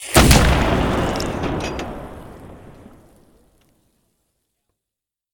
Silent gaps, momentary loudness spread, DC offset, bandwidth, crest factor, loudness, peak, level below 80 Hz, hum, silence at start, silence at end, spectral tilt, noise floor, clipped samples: none; 26 LU; under 0.1%; 19 kHz; 20 dB; -17 LUFS; 0 dBFS; -26 dBFS; none; 0 s; 2.65 s; -4.5 dB/octave; -86 dBFS; under 0.1%